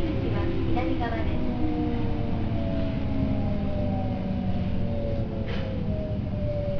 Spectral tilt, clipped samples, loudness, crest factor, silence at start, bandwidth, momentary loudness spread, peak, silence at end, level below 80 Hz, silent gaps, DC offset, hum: -9.5 dB/octave; under 0.1%; -29 LUFS; 14 dB; 0 s; 5.4 kHz; 3 LU; -12 dBFS; 0 s; -32 dBFS; none; under 0.1%; none